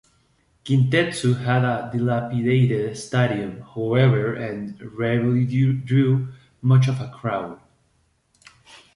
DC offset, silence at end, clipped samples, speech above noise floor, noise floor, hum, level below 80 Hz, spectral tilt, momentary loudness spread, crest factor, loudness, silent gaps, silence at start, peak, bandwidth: under 0.1%; 0.2 s; under 0.1%; 45 dB; -65 dBFS; none; -56 dBFS; -7.5 dB/octave; 11 LU; 16 dB; -21 LUFS; none; 0.65 s; -6 dBFS; 11 kHz